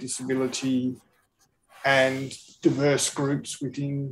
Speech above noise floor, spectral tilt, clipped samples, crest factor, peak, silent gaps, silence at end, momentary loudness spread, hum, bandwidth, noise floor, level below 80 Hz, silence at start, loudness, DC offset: 42 dB; -4.5 dB/octave; under 0.1%; 20 dB; -8 dBFS; none; 0 s; 11 LU; none; 14.5 kHz; -68 dBFS; -70 dBFS; 0 s; -25 LUFS; under 0.1%